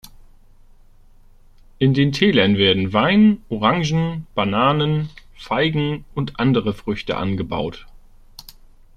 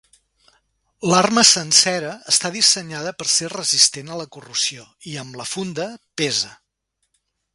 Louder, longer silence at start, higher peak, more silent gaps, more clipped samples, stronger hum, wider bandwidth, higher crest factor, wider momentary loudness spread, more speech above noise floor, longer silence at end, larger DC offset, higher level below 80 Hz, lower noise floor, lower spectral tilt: about the same, -19 LUFS vs -17 LUFS; second, 0.05 s vs 1 s; about the same, -2 dBFS vs 0 dBFS; neither; neither; neither; second, 12.5 kHz vs 16 kHz; about the same, 18 dB vs 22 dB; second, 11 LU vs 19 LU; second, 29 dB vs 54 dB; first, 1.15 s vs 1 s; neither; first, -44 dBFS vs -64 dBFS; second, -47 dBFS vs -74 dBFS; first, -6.5 dB/octave vs -1.5 dB/octave